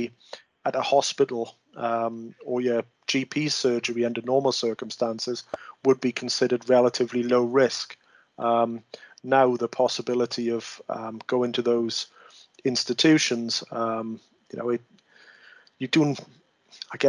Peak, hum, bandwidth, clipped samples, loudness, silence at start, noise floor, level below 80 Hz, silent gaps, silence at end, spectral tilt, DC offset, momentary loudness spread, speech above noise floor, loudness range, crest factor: -6 dBFS; none; 11 kHz; under 0.1%; -25 LUFS; 0 s; -55 dBFS; -74 dBFS; none; 0 s; -4 dB/octave; under 0.1%; 15 LU; 30 dB; 3 LU; 18 dB